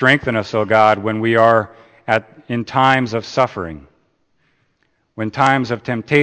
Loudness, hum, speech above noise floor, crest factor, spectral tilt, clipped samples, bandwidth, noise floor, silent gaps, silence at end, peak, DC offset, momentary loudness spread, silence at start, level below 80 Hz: -16 LUFS; none; 48 dB; 18 dB; -6 dB/octave; under 0.1%; 9 kHz; -64 dBFS; none; 0 s; 0 dBFS; under 0.1%; 14 LU; 0 s; -52 dBFS